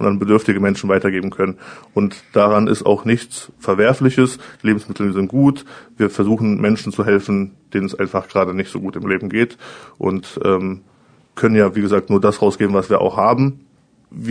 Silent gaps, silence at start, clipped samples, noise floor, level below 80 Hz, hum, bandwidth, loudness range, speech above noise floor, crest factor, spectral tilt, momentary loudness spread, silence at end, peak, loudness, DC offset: none; 0 s; under 0.1%; -49 dBFS; -54 dBFS; none; 10 kHz; 4 LU; 33 dB; 16 dB; -7 dB/octave; 9 LU; 0 s; 0 dBFS; -17 LUFS; under 0.1%